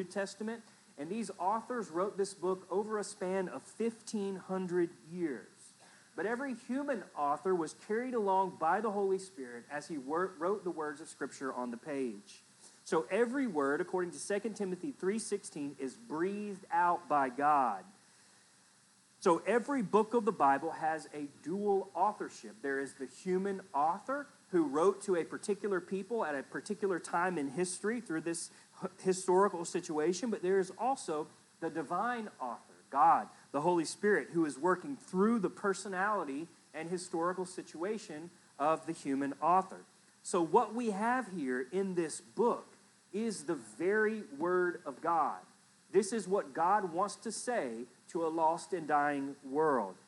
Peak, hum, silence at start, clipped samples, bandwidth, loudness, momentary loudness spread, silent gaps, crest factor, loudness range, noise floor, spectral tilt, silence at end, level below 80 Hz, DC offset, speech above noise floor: -14 dBFS; none; 0 s; under 0.1%; 12 kHz; -35 LUFS; 12 LU; none; 20 dB; 4 LU; -66 dBFS; -5 dB/octave; 0.15 s; under -90 dBFS; under 0.1%; 32 dB